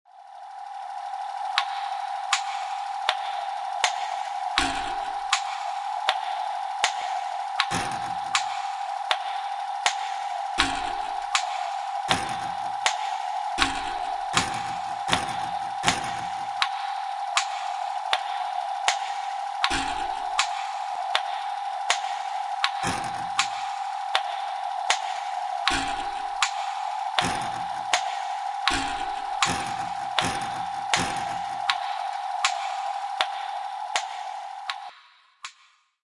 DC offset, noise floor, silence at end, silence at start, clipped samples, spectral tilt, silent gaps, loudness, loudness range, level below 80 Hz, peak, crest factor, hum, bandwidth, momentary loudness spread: under 0.1%; -60 dBFS; 0.5 s; 0.15 s; under 0.1%; -1.5 dB/octave; none; -27 LUFS; 1 LU; -54 dBFS; -2 dBFS; 26 dB; none; 11.5 kHz; 6 LU